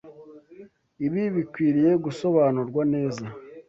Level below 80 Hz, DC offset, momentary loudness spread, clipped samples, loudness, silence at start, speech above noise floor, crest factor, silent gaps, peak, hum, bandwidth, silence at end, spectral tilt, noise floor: -64 dBFS; under 0.1%; 9 LU; under 0.1%; -24 LUFS; 0.05 s; 26 dB; 16 dB; none; -8 dBFS; none; 7.8 kHz; 0.1 s; -8.5 dB/octave; -49 dBFS